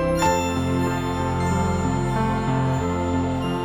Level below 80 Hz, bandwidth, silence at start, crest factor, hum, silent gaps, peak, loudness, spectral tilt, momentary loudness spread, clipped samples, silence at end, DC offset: -36 dBFS; 18 kHz; 0 s; 14 dB; none; none; -8 dBFS; -23 LUFS; -6 dB/octave; 3 LU; under 0.1%; 0 s; under 0.1%